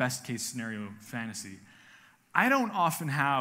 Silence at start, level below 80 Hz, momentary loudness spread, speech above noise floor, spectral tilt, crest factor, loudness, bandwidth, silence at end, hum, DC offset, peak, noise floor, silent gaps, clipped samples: 0 s; -78 dBFS; 15 LU; 28 dB; -4 dB/octave; 24 dB; -30 LUFS; 16 kHz; 0 s; none; under 0.1%; -6 dBFS; -58 dBFS; none; under 0.1%